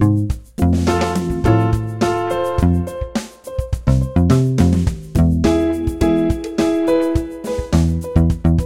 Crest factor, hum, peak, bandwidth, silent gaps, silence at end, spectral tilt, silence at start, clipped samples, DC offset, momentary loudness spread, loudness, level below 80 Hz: 16 dB; none; 0 dBFS; 15.5 kHz; none; 0 s; -7.5 dB/octave; 0 s; under 0.1%; 0.2%; 9 LU; -17 LUFS; -26 dBFS